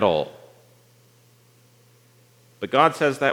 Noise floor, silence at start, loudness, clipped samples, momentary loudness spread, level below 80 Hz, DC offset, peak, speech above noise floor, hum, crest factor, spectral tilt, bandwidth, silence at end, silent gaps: -56 dBFS; 0 s; -22 LUFS; under 0.1%; 16 LU; -68 dBFS; under 0.1%; -2 dBFS; 36 dB; 60 Hz at -60 dBFS; 22 dB; -5 dB/octave; 19.5 kHz; 0 s; none